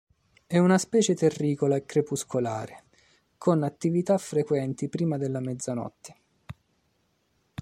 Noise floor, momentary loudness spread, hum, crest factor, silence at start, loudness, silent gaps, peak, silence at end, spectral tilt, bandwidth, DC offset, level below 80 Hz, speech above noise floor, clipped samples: -71 dBFS; 15 LU; none; 18 dB; 0.5 s; -26 LUFS; none; -8 dBFS; 1.1 s; -6 dB/octave; 14.5 kHz; under 0.1%; -66 dBFS; 45 dB; under 0.1%